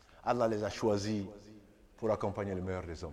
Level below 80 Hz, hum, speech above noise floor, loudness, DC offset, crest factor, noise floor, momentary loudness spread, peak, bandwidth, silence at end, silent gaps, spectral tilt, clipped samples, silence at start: -58 dBFS; none; 24 dB; -35 LUFS; under 0.1%; 18 dB; -58 dBFS; 8 LU; -16 dBFS; 13.5 kHz; 0 s; none; -6 dB/octave; under 0.1%; 0.1 s